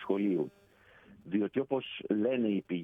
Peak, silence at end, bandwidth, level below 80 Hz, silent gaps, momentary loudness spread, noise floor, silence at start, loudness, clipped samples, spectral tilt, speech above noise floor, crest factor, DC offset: -18 dBFS; 0 s; 3.8 kHz; -74 dBFS; none; 6 LU; -60 dBFS; 0 s; -33 LUFS; under 0.1%; -9 dB/octave; 29 dB; 16 dB; under 0.1%